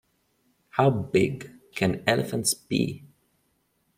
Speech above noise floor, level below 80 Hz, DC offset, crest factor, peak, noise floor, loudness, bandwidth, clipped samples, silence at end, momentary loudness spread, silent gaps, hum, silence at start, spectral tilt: 46 dB; -58 dBFS; under 0.1%; 24 dB; -4 dBFS; -71 dBFS; -25 LUFS; 16 kHz; under 0.1%; 0.9 s; 12 LU; none; none; 0.75 s; -4.5 dB/octave